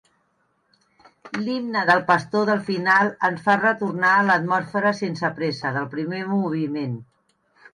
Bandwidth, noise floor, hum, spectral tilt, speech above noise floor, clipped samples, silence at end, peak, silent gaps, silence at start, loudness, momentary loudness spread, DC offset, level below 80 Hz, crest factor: 11 kHz; -68 dBFS; none; -6 dB/octave; 46 dB; under 0.1%; 0.7 s; -4 dBFS; none; 1.25 s; -21 LUFS; 10 LU; under 0.1%; -68 dBFS; 18 dB